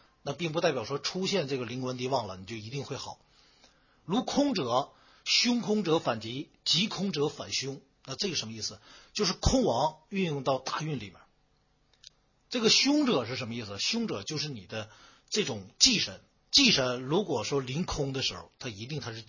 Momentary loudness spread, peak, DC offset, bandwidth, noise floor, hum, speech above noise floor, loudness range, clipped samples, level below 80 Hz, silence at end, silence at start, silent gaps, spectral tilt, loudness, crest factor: 16 LU; -8 dBFS; under 0.1%; 7.4 kHz; -69 dBFS; none; 39 dB; 6 LU; under 0.1%; -50 dBFS; 0.05 s; 0.25 s; none; -3.5 dB/octave; -29 LUFS; 24 dB